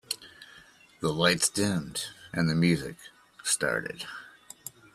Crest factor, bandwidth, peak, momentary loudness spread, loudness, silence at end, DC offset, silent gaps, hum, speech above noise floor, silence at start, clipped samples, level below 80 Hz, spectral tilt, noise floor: 22 dB; 14 kHz; -8 dBFS; 20 LU; -28 LUFS; 0.25 s; under 0.1%; none; none; 27 dB; 0.1 s; under 0.1%; -60 dBFS; -3.5 dB/octave; -55 dBFS